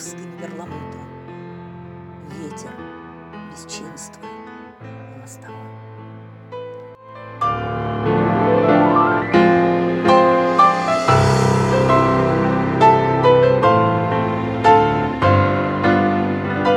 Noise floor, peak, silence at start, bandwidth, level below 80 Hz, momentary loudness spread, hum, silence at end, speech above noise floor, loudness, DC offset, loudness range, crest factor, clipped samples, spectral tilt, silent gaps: -37 dBFS; 0 dBFS; 0 s; 12 kHz; -44 dBFS; 23 LU; none; 0 s; 4 dB; -15 LUFS; under 0.1%; 21 LU; 18 dB; under 0.1%; -6.5 dB/octave; none